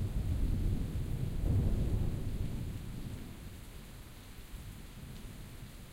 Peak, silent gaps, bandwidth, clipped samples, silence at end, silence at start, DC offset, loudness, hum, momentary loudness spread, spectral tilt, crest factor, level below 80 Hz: -20 dBFS; none; 16 kHz; under 0.1%; 0 s; 0 s; under 0.1%; -38 LUFS; none; 17 LU; -7 dB/octave; 16 dB; -38 dBFS